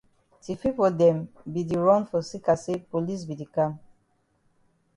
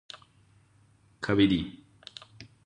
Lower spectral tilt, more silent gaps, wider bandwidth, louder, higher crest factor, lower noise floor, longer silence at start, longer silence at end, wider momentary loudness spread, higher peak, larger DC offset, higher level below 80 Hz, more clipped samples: about the same, -7.5 dB/octave vs -6.5 dB/octave; neither; first, 11 kHz vs 9.6 kHz; about the same, -26 LUFS vs -27 LUFS; about the same, 20 dB vs 22 dB; first, -69 dBFS vs -62 dBFS; second, 0.45 s vs 1.2 s; first, 1.2 s vs 0.2 s; second, 13 LU vs 24 LU; about the same, -8 dBFS vs -10 dBFS; neither; second, -60 dBFS vs -54 dBFS; neither